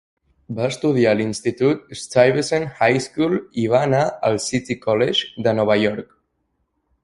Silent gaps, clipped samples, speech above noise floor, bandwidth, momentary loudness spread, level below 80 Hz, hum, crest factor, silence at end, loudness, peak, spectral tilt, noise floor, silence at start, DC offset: none; under 0.1%; 52 dB; 11.5 kHz; 7 LU; -56 dBFS; none; 18 dB; 1 s; -19 LUFS; -2 dBFS; -5 dB/octave; -71 dBFS; 0.5 s; under 0.1%